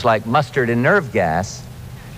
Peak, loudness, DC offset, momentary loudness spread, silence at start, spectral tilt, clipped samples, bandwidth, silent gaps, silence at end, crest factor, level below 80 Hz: -4 dBFS; -17 LUFS; under 0.1%; 18 LU; 0 s; -6 dB/octave; under 0.1%; 15.5 kHz; none; 0 s; 16 dB; -44 dBFS